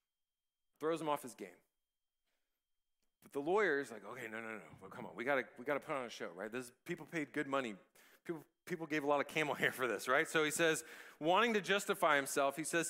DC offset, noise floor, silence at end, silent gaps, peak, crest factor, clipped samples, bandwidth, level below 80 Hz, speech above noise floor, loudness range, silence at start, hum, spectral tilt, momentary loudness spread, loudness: under 0.1%; under -90 dBFS; 0 s; none; -16 dBFS; 22 dB; under 0.1%; 16 kHz; -86 dBFS; over 52 dB; 9 LU; 0.8 s; none; -3.5 dB/octave; 16 LU; -37 LUFS